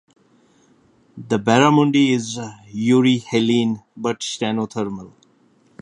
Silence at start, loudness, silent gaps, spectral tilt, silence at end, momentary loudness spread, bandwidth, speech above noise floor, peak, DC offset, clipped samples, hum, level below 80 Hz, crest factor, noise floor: 1.15 s; -19 LUFS; none; -5.5 dB/octave; 0.75 s; 14 LU; 11 kHz; 39 dB; 0 dBFS; under 0.1%; under 0.1%; none; -62 dBFS; 20 dB; -57 dBFS